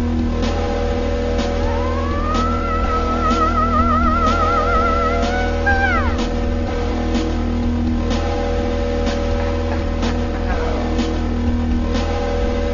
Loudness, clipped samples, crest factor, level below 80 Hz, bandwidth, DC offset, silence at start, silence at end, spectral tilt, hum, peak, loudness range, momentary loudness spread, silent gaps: -19 LUFS; under 0.1%; 14 dB; -22 dBFS; 7.4 kHz; under 0.1%; 0 s; 0 s; -6.5 dB/octave; none; -4 dBFS; 4 LU; 5 LU; none